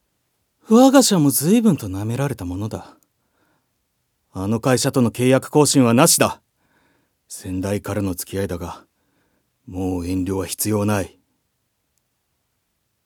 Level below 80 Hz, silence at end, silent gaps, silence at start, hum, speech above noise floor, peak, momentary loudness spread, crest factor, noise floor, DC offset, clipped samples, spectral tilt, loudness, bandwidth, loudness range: -58 dBFS; 2 s; none; 0.7 s; none; 53 dB; 0 dBFS; 20 LU; 20 dB; -71 dBFS; under 0.1%; under 0.1%; -5 dB/octave; -18 LUFS; over 20 kHz; 9 LU